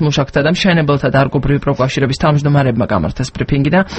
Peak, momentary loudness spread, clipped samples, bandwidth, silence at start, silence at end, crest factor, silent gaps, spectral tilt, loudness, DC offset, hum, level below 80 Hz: 0 dBFS; 5 LU; under 0.1%; 8.6 kHz; 0 s; 0 s; 14 dB; none; -6.5 dB/octave; -14 LUFS; under 0.1%; none; -32 dBFS